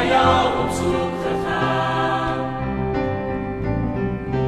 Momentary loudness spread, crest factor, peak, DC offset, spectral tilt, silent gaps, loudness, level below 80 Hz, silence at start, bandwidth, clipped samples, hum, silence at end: 8 LU; 18 dB; -2 dBFS; under 0.1%; -6 dB/octave; none; -21 LUFS; -36 dBFS; 0 s; 13.5 kHz; under 0.1%; none; 0 s